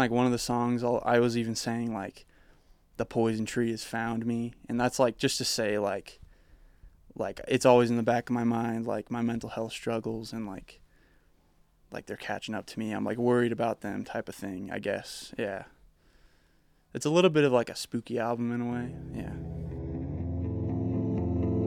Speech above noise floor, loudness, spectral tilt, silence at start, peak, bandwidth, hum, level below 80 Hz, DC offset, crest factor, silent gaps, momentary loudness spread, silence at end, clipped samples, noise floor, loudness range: 36 dB; -30 LUFS; -5.5 dB/octave; 0 s; -6 dBFS; 16 kHz; none; -54 dBFS; under 0.1%; 24 dB; none; 13 LU; 0 s; under 0.1%; -65 dBFS; 8 LU